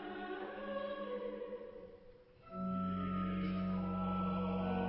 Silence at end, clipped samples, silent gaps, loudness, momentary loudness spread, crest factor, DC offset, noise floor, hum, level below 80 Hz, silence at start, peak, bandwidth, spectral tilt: 0 s; under 0.1%; none; -40 LUFS; 13 LU; 12 dB; under 0.1%; -60 dBFS; none; -58 dBFS; 0 s; -28 dBFS; 5.4 kHz; -7 dB/octave